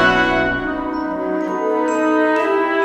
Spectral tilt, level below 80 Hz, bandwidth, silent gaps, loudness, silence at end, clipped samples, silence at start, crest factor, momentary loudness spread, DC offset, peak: -5.5 dB/octave; -40 dBFS; 9.2 kHz; none; -18 LUFS; 0 s; under 0.1%; 0 s; 16 dB; 7 LU; under 0.1%; -2 dBFS